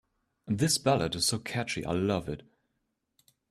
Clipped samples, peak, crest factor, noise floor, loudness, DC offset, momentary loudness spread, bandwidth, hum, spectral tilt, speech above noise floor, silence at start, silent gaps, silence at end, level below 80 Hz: under 0.1%; -12 dBFS; 20 dB; -80 dBFS; -29 LUFS; under 0.1%; 9 LU; 15 kHz; none; -4 dB/octave; 51 dB; 0.45 s; none; 1.1 s; -58 dBFS